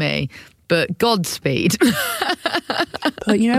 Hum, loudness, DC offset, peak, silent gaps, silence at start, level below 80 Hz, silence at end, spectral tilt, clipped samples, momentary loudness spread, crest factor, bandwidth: none; -19 LUFS; under 0.1%; -4 dBFS; none; 0 s; -52 dBFS; 0 s; -4.5 dB/octave; under 0.1%; 6 LU; 14 dB; 16.5 kHz